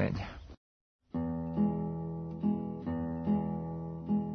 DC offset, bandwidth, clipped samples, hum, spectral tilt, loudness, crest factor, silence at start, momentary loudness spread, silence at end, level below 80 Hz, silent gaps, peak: under 0.1%; 6 kHz; under 0.1%; none; -10 dB/octave; -35 LUFS; 16 dB; 0 s; 9 LU; 0 s; -56 dBFS; 0.57-0.99 s; -18 dBFS